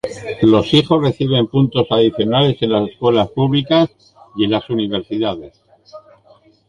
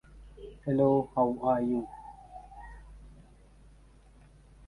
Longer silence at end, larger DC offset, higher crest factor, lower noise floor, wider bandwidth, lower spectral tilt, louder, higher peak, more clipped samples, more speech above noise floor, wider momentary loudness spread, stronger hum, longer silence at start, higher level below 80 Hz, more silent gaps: second, 0.7 s vs 1.55 s; neither; about the same, 16 dB vs 20 dB; second, -50 dBFS vs -57 dBFS; about the same, 11 kHz vs 11 kHz; second, -7.5 dB/octave vs -10 dB/octave; first, -16 LUFS vs -29 LUFS; first, 0 dBFS vs -14 dBFS; neither; first, 35 dB vs 29 dB; second, 8 LU vs 24 LU; neither; about the same, 0.05 s vs 0.15 s; first, -46 dBFS vs -54 dBFS; neither